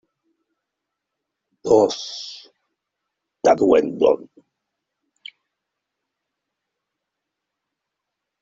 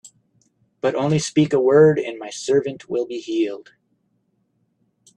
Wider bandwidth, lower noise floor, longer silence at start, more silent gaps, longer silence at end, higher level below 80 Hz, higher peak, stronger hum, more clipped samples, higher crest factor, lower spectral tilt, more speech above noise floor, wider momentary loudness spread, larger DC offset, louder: second, 7.8 kHz vs 10.5 kHz; first, -82 dBFS vs -68 dBFS; first, 1.65 s vs 0.05 s; neither; first, 4.2 s vs 1.55 s; about the same, -62 dBFS vs -62 dBFS; about the same, -2 dBFS vs -4 dBFS; neither; neither; about the same, 22 dB vs 18 dB; second, -4.5 dB/octave vs -6 dB/octave; first, 64 dB vs 49 dB; first, 17 LU vs 12 LU; neither; about the same, -18 LUFS vs -20 LUFS